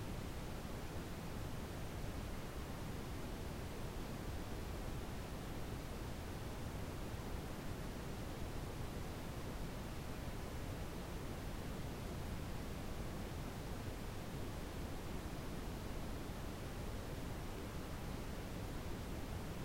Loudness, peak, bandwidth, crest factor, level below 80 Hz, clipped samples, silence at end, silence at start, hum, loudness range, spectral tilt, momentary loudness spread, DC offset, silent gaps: -47 LUFS; -32 dBFS; 16 kHz; 14 dB; -50 dBFS; under 0.1%; 0 s; 0 s; none; 0 LU; -5.5 dB/octave; 1 LU; under 0.1%; none